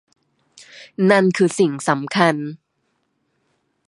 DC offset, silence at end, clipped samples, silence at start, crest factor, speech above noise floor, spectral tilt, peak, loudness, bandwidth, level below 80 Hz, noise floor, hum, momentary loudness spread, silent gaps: under 0.1%; 1.35 s; under 0.1%; 0.6 s; 20 dB; 52 dB; -5.5 dB/octave; 0 dBFS; -18 LUFS; 11.5 kHz; -70 dBFS; -70 dBFS; none; 18 LU; none